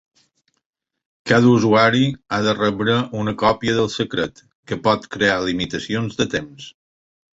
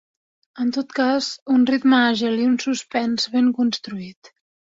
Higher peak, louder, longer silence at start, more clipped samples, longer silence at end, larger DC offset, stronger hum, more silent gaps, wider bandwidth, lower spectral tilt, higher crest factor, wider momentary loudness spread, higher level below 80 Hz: about the same, -2 dBFS vs -4 dBFS; about the same, -19 LUFS vs -20 LUFS; first, 1.25 s vs 0.55 s; neither; first, 0.7 s vs 0.55 s; neither; neither; about the same, 4.55-4.63 s vs 1.42-1.46 s; about the same, 8 kHz vs 7.8 kHz; first, -5.5 dB/octave vs -4 dB/octave; about the same, 18 dB vs 16 dB; first, 13 LU vs 10 LU; first, -50 dBFS vs -66 dBFS